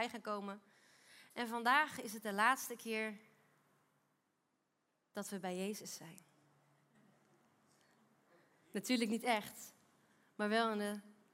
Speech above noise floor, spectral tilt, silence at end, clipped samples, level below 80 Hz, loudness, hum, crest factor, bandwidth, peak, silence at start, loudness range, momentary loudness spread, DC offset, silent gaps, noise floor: 44 dB; -3.5 dB/octave; 0.2 s; under 0.1%; under -90 dBFS; -39 LUFS; none; 24 dB; 16 kHz; -18 dBFS; 0 s; 11 LU; 18 LU; under 0.1%; none; -84 dBFS